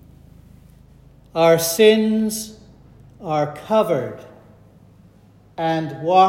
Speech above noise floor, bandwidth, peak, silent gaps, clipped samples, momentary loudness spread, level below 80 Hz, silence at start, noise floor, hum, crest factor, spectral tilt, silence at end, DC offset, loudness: 33 dB; 16.5 kHz; -2 dBFS; none; under 0.1%; 20 LU; -54 dBFS; 1.35 s; -50 dBFS; none; 18 dB; -4.5 dB/octave; 0 s; under 0.1%; -19 LUFS